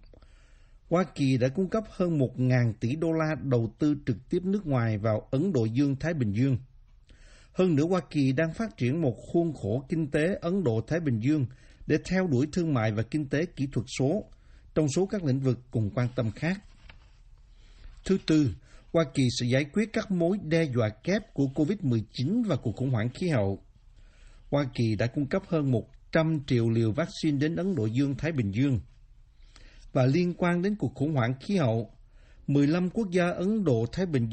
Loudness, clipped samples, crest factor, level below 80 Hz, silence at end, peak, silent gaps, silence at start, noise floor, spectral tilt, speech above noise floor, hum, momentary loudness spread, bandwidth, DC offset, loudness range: -28 LUFS; under 0.1%; 16 dB; -52 dBFS; 0 s; -10 dBFS; none; 0.9 s; -55 dBFS; -7.5 dB/octave; 28 dB; none; 5 LU; 8.8 kHz; under 0.1%; 2 LU